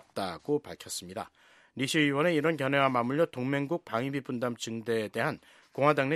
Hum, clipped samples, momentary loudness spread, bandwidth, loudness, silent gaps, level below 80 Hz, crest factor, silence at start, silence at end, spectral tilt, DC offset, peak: none; under 0.1%; 13 LU; 14.5 kHz; -30 LUFS; none; -72 dBFS; 22 dB; 0.15 s; 0 s; -5 dB/octave; under 0.1%; -8 dBFS